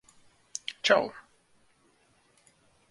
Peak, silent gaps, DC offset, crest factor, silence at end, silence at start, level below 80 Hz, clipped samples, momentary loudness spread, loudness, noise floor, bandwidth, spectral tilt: -8 dBFS; none; under 0.1%; 26 dB; 1.7 s; 0.7 s; -76 dBFS; under 0.1%; 18 LU; -28 LUFS; -66 dBFS; 11.5 kHz; -2 dB/octave